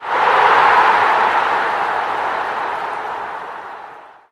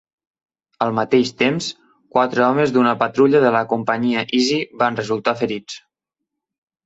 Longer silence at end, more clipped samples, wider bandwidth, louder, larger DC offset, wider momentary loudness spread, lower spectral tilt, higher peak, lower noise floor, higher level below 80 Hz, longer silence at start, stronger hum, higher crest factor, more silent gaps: second, 0.25 s vs 1.05 s; neither; first, 13 kHz vs 8 kHz; first, -15 LUFS vs -18 LUFS; neither; first, 18 LU vs 9 LU; second, -3 dB/octave vs -5 dB/octave; about the same, 0 dBFS vs -2 dBFS; second, -38 dBFS vs -82 dBFS; about the same, -58 dBFS vs -62 dBFS; second, 0 s vs 0.8 s; neither; about the same, 16 dB vs 16 dB; neither